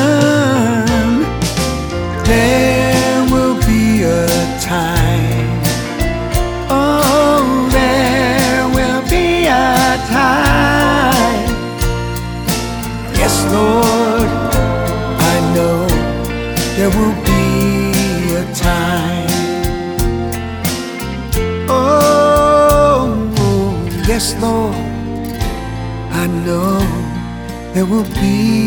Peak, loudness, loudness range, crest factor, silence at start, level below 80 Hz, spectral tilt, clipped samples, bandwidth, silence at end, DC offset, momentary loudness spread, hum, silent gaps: 0 dBFS; -14 LUFS; 5 LU; 14 dB; 0 s; -24 dBFS; -5 dB/octave; under 0.1%; over 20 kHz; 0 s; under 0.1%; 9 LU; none; none